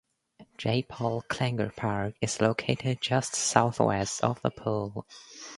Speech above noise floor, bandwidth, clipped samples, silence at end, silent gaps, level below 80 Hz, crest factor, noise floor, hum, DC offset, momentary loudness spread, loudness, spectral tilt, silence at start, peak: 29 dB; 11.5 kHz; under 0.1%; 0 s; none; -58 dBFS; 26 dB; -58 dBFS; none; under 0.1%; 9 LU; -29 LUFS; -4.5 dB/octave; 0.4 s; -4 dBFS